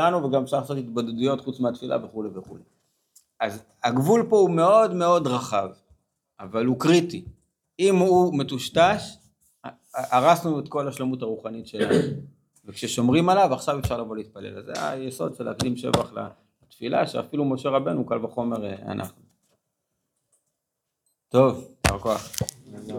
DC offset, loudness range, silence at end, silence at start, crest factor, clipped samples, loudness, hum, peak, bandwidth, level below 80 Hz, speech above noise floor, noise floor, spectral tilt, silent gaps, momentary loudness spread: under 0.1%; 7 LU; 0 s; 0 s; 22 dB; under 0.1%; -24 LUFS; none; -2 dBFS; 17.5 kHz; -52 dBFS; 59 dB; -82 dBFS; -5.5 dB/octave; none; 16 LU